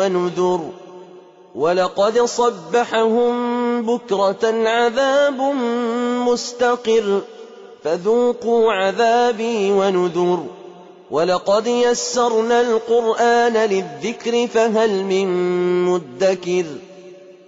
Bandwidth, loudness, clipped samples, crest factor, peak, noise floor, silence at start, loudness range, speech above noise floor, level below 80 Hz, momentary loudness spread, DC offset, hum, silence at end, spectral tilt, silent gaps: 8 kHz; -18 LUFS; under 0.1%; 12 dB; -6 dBFS; -43 dBFS; 0 s; 2 LU; 26 dB; -64 dBFS; 7 LU; under 0.1%; none; 0.15 s; -4.5 dB/octave; none